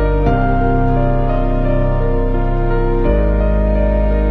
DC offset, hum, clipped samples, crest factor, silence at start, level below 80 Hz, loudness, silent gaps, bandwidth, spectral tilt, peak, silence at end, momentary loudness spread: under 0.1%; none; under 0.1%; 12 dB; 0 s; -16 dBFS; -16 LUFS; none; 4.4 kHz; -10.5 dB/octave; -2 dBFS; 0 s; 3 LU